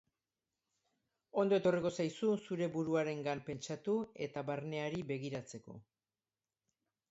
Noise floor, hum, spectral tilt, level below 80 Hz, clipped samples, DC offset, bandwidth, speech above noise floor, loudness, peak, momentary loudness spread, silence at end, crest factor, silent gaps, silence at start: under -90 dBFS; none; -6 dB/octave; -76 dBFS; under 0.1%; under 0.1%; 8 kHz; over 53 dB; -37 LUFS; -20 dBFS; 12 LU; 1.3 s; 18 dB; none; 1.35 s